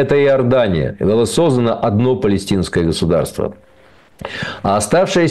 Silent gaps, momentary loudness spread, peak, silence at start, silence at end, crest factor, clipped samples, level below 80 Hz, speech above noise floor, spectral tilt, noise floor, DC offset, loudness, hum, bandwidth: none; 11 LU; -6 dBFS; 0 s; 0 s; 10 dB; under 0.1%; -38 dBFS; 33 dB; -6 dB/octave; -48 dBFS; under 0.1%; -15 LUFS; none; 12.5 kHz